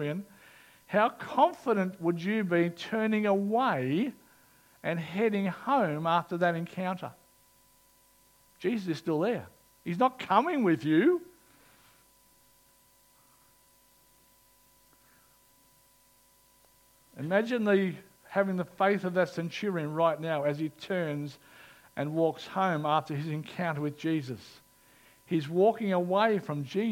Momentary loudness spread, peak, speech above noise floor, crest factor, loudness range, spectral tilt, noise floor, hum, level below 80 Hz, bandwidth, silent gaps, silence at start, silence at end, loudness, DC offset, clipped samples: 10 LU; -10 dBFS; 35 dB; 22 dB; 5 LU; -7 dB/octave; -64 dBFS; none; -76 dBFS; 17 kHz; none; 0 s; 0 s; -30 LUFS; under 0.1%; under 0.1%